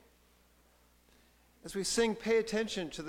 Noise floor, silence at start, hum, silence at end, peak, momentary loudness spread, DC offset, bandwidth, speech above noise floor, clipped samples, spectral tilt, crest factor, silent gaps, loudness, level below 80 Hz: -66 dBFS; 1.65 s; 60 Hz at -65 dBFS; 0 s; -18 dBFS; 11 LU; under 0.1%; 16.5 kHz; 33 dB; under 0.1%; -3 dB/octave; 18 dB; none; -33 LUFS; -62 dBFS